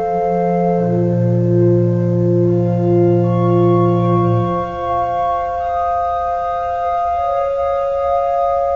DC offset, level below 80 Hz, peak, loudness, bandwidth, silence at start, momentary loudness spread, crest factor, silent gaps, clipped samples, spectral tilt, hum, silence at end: 0.4%; -40 dBFS; -2 dBFS; -16 LUFS; 5.8 kHz; 0 s; 6 LU; 12 dB; none; under 0.1%; -10.5 dB/octave; none; 0 s